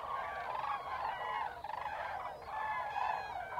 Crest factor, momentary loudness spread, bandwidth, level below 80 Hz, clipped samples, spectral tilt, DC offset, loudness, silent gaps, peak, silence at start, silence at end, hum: 16 dB; 5 LU; 16 kHz; -66 dBFS; under 0.1%; -3.5 dB/octave; under 0.1%; -40 LUFS; none; -24 dBFS; 0 s; 0 s; none